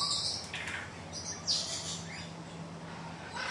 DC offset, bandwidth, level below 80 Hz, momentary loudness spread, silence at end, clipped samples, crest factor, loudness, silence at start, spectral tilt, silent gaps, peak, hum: under 0.1%; 11.5 kHz; -66 dBFS; 13 LU; 0 s; under 0.1%; 20 dB; -36 LUFS; 0 s; -1.5 dB/octave; none; -18 dBFS; none